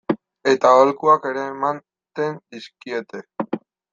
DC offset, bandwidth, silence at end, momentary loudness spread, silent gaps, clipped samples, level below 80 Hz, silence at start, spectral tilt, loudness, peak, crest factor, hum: under 0.1%; 7.6 kHz; 0.35 s; 21 LU; none; under 0.1%; -68 dBFS; 0.1 s; -5.5 dB/octave; -20 LUFS; -2 dBFS; 18 dB; none